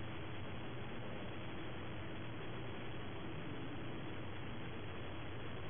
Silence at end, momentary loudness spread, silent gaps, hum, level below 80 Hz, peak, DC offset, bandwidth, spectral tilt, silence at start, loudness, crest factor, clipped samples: 0 s; 1 LU; none; none; -60 dBFS; -34 dBFS; 0.5%; 3.6 kHz; -4.5 dB/octave; 0 s; -48 LUFS; 12 dB; under 0.1%